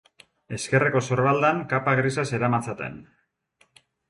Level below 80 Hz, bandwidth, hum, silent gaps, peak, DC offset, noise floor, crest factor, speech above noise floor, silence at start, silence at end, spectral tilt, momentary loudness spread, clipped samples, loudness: -60 dBFS; 11.5 kHz; none; none; -8 dBFS; under 0.1%; -65 dBFS; 18 dB; 42 dB; 0.5 s; 1.05 s; -6 dB/octave; 13 LU; under 0.1%; -23 LUFS